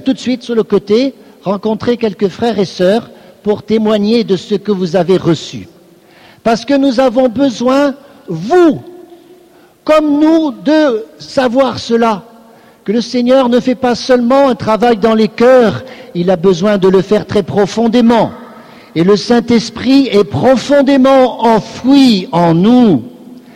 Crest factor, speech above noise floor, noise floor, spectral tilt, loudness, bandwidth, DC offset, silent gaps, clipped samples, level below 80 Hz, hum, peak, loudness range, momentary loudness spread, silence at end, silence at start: 10 dB; 33 dB; -43 dBFS; -6.5 dB/octave; -11 LUFS; 12.5 kHz; under 0.1%; none; under 0.1%; -46 dBFS; none; 0 dBFS; 4 LU; 10 LU; 0.15 s; 0 s